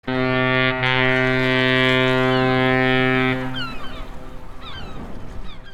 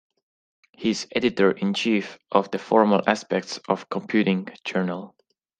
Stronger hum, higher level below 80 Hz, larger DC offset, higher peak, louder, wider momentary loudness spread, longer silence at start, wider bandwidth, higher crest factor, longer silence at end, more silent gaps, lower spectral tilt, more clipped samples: neither; first, -38 dBFS vs -66 dBFS; neither; about the same, -4 dBFS vs -2 dBFS; first, -18 LUFS vs -23 LUFS; first, 21 LU vs 8 LU; second, 0.05 s vs 0.8 s; first, 12 kHz vs 9.2 kHz; second, 16 dB vs 22 dB; second, 0 s vs 0.55 s; neither; about the same, -6.5 dB/octave vs -5.5 dB/octave; neither